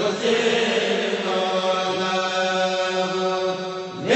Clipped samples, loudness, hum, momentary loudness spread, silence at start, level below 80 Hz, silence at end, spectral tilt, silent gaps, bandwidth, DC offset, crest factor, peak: under 0.1%; -22 LUFS; none; 5 LU; 0 s; -70 dBFS; 0 s; -3.5 dB/octave; none; 8.4 kHz; under 0.1%; 16 dB; -6 dBFS